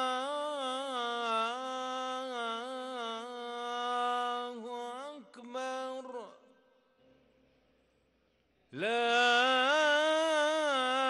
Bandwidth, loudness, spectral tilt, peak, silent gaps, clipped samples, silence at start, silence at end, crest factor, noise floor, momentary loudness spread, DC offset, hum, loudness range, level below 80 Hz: 12 kHz; -32 LUFS; -1.5 dB/octave; -18 dBFS; none; under 0.1%; 0 s; 0 s; 16 dB; -73 dBFS; 16 LU; under 0.1%; none; 15 LU; -86 dBFS